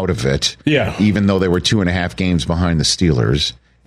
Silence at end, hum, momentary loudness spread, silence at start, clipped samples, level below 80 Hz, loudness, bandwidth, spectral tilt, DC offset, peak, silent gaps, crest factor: 0.3 s; none; 4 LU; 0 s; under 0.1%; -32 dBFS; -16 LUFS; 13 kHz; -5 dB/octave; under 0.1%; -4 dBFS; none; 12 dB